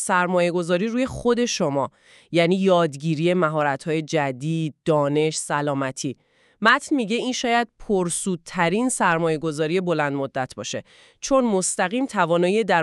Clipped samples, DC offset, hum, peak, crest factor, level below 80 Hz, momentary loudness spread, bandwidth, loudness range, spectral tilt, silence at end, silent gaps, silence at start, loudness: under 0.1%; under 0.1%; none; -2 dBFS; 20 dB; -56 dBFS; 8 LU; 13 kHz; 2 LU; -4.5 dB/octave; 0 s; none; 0 s; -22 LUFS